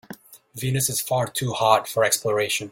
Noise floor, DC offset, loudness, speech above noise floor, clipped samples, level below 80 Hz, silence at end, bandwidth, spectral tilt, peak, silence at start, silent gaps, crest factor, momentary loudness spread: -44 dBFS; under 0.1%; -22 LUFS; 21 dB; under 0.1%; -58 dBFS; 0 s; 17 kHz; -3 dB/octave; -2 dBFS; 0.1 s; none; 22 dB; 18 LU